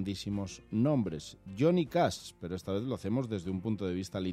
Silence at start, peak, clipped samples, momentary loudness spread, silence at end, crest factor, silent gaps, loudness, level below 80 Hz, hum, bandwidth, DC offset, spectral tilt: 0 s; -16 dBFS; under 0.1%; 12 LU; 0 s; 18 dB; none; -33 LUFS; -62 dBFS; none; 15 kHz; under 0.1%; -6.5 dB/octave